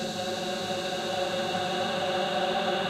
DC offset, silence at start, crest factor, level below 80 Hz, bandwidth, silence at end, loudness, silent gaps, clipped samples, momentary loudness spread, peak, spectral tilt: under 0.1%; 0 s; 14 dB; -64 dBFS; 16 kHz; 0 s; -29 LUFS; none; under 0.1%; 4 LU; -16 dBFS; -3.5 dB/octave